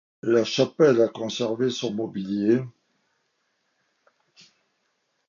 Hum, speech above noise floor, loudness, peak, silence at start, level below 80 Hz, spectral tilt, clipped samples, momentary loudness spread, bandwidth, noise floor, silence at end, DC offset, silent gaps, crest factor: none; 51 dB; -23 LUFS; -8 dBFS; 0.25 s; -70 dBFS; -5.5 dB/octave; under 0.1%; 10 LU; 7.4 kHz; -73 dBFS; 2.6 s; under 0.1%; none; 18 dB